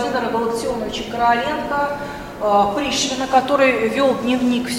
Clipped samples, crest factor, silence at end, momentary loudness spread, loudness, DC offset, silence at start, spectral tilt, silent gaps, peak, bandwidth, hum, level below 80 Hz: under 0.1%; 16 dB; 0 s; 8 LU; -19 LUFS; under 0.1%; 0 s; -3.5 dB/octave; none; -2 dBFS; 16.5 kHz; none; -46 dBFS